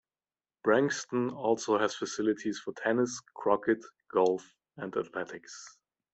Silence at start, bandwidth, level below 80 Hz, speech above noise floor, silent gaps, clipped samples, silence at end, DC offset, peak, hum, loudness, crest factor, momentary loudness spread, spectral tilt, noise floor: 0.65 s; 8.2 kHz; -74 dBFS; over 60 dB; none; under 0.1%; 0.45 s; under 0.1%; -10 dBFS; none; -31 LUFS; 20 dB; 13 LU; -4.5 dB/octave; under -90 dBFS